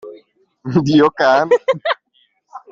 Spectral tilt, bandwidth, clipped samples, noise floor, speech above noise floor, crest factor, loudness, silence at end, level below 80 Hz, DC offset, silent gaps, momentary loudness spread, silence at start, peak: -6.5 dB/octave; 7.4 kHz; under 0.1%; -60 dBFS; 47 dB; 14 dB; -15 LUFS; 0.15 s; -56 dBFS; under 0.1%; none; 11 LU; 0.05 s; -2 dBFS